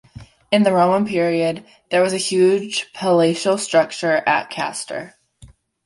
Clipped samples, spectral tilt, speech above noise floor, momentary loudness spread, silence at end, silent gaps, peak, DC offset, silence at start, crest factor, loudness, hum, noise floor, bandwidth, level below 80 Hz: under 0.1%; -4.5 dB/octave; 30 dB; 9 LU; 0.4 s; none; -2 dBFS; under 0.1%; 0.2 s; 16 dB; -18 LUFS; none; -48 dBFS; 11.5 kHz; -58 dBFS